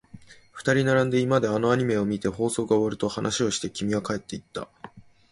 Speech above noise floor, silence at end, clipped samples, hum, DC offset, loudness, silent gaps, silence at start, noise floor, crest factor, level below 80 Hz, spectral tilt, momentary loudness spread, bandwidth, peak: 24 dB; 0.3 s; under 0.1%; none; under 0.1%; -25 LUFS; none; 0.15 s; -48 dBFS; 18 dB; -56 dBFS; -5 dB/octave; 13 LU; 11.5 kHz; -8 dBFS